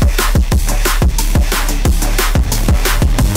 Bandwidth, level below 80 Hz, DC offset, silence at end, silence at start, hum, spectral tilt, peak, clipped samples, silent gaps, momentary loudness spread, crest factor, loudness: 16.5 kHz; -12 dBFS; under 0.1%; 0 s; 0 s; none; -4.5 dB/octave; 0 dBFS; under 0.1%; none; 2 LU; 12 dB; -15 LUFS